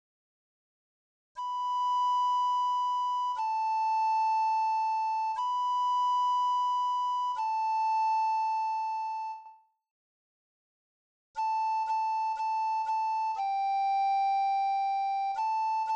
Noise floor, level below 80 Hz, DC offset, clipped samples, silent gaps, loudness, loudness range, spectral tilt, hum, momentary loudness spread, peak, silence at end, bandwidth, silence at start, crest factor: -55 dBFS; -86 dBFS; under 0.1%; under 0.1%; 9.91-11.34 s; -29 LUFS; 6 LU; 3 dB/octave; none; 5 LU; -24 dBFS; 0 s; 8.4 kHz; 1.35 s; 6 dB